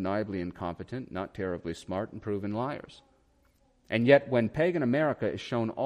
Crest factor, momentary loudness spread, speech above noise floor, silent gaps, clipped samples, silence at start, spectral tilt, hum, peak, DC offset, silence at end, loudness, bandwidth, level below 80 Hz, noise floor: 24 dB; 15 LU; 37 dB; none; under 0.1%; 0 s; -7.5 dB/octave; none; -6 dBFS; under 0.1%; 0 s; -30 LUFS; 10.5 kHz; -60 dBFS; -66 dBFS